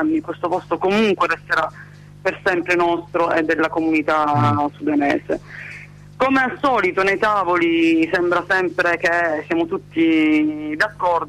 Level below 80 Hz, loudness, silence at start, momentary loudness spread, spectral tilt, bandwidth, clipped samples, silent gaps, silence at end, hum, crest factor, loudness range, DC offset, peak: -52 dBFS; -18 LUFS; 0 s; 7 LU; -6 dB/octave; 11.5 kHz; under 0.1%; none; 0 s; 50 Hz at -45 dBFS; 12 dB; 2 LU; under 0.1%; -8 dBFS